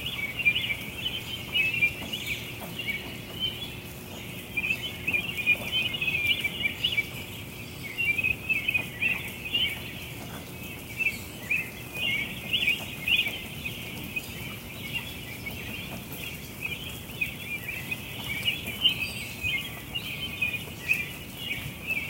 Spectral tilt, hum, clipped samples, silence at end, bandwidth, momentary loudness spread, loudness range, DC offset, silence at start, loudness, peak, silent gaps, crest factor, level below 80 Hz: -2.5 dB/octave; none; under 0.1%; 0 s; 17 kHz; 13 LU; 7 LU; under 0.1%; 0 s; -29 LUFS; -10 dBFS; none; 22 dB; -52 dBFS